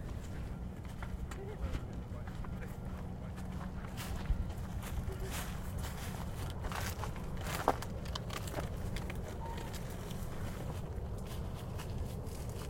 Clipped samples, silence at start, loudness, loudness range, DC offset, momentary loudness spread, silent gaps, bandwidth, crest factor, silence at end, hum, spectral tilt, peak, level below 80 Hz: under 0.1%; 0 s; -42 LUFS; 4 LU; under 0.1%; 5 LU; none; 16.5 kHz; 30 dB; 0 s; none; -5.5 dB/octave; -10 dBFS; -44 dBFS